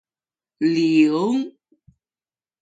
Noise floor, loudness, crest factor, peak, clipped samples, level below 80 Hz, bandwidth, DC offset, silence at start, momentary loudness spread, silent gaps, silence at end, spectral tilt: under -90 dBFS; -19 LUFS; 18 dB; -6 dBFS; under 0.1%; -70 dBFS; 7.8 kHz; under 0.1%; 0.6 s; 9 LU; none; 1.1 s; -6.5 dB/octave